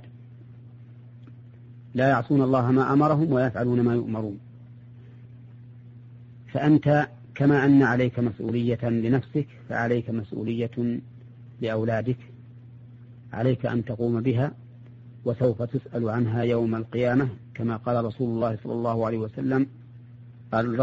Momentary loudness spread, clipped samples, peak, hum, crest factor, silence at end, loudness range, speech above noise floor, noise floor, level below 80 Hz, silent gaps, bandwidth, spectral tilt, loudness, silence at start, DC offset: 11 LU; under 0.1%; -8 dBFS; none; 16 dB; 0 s; 6 LU; 22 dB; -46 dBFS; -58 dBFS; none; 7.2 kHz; -7.5 dB/octave; -25 LUFS; 0 s; under 0.1%